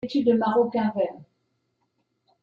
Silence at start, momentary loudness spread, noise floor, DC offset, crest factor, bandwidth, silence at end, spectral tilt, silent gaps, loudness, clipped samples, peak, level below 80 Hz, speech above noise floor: 0.05 s; 8 LU; -74 dBFS; under 0.1%; 16 dB; 7 kHz; 1.2 s; -8 dB/octave; none; -24 LUFS; under 0.1%; -10 dBFS; -68 dBFS; 51 dB